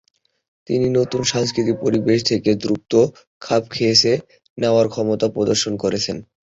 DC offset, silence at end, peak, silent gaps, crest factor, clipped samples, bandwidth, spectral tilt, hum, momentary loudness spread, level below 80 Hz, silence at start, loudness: under 0.1%; 0.25 s; -2 dBFS; 3.27-3.41 s, 4.50-4.56 s; 18 dB; under 0.1%; 8 kHz; -4.5 dB/octave; none; 7 LU; -52 dBFS; 0.7 s; -19 LUFS